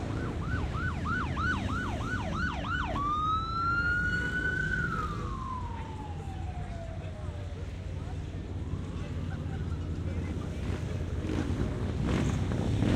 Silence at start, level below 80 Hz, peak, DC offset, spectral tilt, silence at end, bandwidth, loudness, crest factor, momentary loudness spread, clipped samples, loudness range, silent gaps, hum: 0 s; -40 dBFS; -14 dBFS; under 0.1%; -6.5 dB/octave; 0 s; 10.5 kHz; -33 LUFS; 18 dB; 10 LU; under 0.1%; 8 LU; none; none